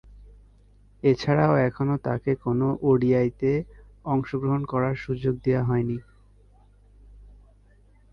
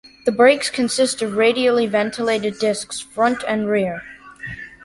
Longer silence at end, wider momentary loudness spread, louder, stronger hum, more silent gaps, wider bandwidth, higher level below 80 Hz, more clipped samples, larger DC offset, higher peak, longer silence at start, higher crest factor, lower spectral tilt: first, 0.85 s vs 0.15 s; second, 7 LU vs 17 LU; second, -24 LUFS vs -19 LUFS; first, 50 Hz at -50 dBFS vs none; neither; second, 6.8 kHz vs 11.5 kHz; first, -50 dBFS vs -56 dBFS; neither; neither; second, -8 dBFS vs -2 dBFS; second, 0.1 s vs 0.25 s; about the same, 18 dB vs 18 dB; first, -9 dB/octave vs -3.5 dB/octave